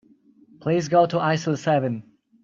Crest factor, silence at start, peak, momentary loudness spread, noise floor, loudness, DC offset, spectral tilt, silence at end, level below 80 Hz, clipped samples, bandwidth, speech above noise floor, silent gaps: 18 dB; 0.6 s; -6 dBFS; 11 LU; -55 dBFS; -22 LUFS; under 0.1%; -6.5 dB/octave; 0.4 s; -66 dBFS; under 0.1%; 7.6 kHz; 34 dB; none